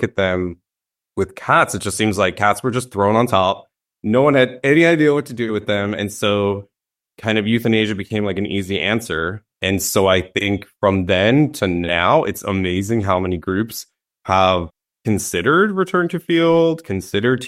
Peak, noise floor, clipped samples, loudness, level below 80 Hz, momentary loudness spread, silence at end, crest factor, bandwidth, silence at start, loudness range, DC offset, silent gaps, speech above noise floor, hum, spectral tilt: -2 dBFS; -87 dBFS; under 0.1%; -18 LUFS; -48 dBFS; 9 LU; 0 s; 16 dB; 15.5 kHz; 0 s; 4 LU; under 0.1%; none; 69 dB; none; -5 dB/octave